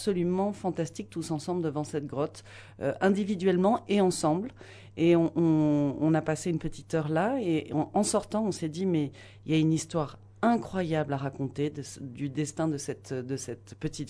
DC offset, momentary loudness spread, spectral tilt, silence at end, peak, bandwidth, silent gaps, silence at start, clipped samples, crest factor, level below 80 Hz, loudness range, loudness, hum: under 0.1%; 12 LU; -6 dB/octave; 0 s; -10 dBFS; 11 kHz; none; 0 s; under 0.1%; 18 dB; -58 dBFS; 5 LU; -29 LUFS; none